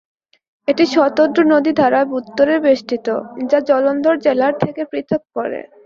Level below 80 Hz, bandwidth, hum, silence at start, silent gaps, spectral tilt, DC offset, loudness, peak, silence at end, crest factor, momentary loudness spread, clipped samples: -60 dBFS; 7.2 kHz; none; 0.7 s; none; -6 dB/octave; under 0.1%; -16 LUFS; -2 dBFS; 0.25 s; 14 dB; 9 LU; under 0.1%